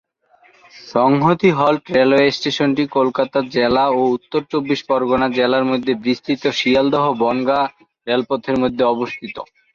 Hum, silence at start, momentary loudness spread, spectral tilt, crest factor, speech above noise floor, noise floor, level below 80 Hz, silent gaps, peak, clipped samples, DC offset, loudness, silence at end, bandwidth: none; 0.75 s; 7 LU; -6 dB/octave; 16 dB; 37 dB; -54 dBFS; -52 dBFS; none; -2 dBFS; under 0.1%; under 0.1%; -17 LUFS; 0.3 s; 7.4 kHz